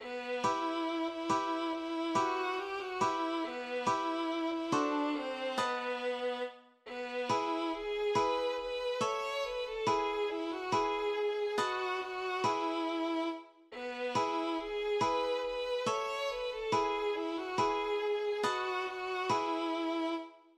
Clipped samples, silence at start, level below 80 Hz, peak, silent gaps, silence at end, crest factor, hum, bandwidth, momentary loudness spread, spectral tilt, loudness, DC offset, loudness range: under 0.1%; 0 s; -66 dBFS; -18 dBFS; none; 0.2 s; 16 dB; none; 13 kHz; 5 LU; -4 dB/octave; -34 LUFS; under 0.1%; 1 LU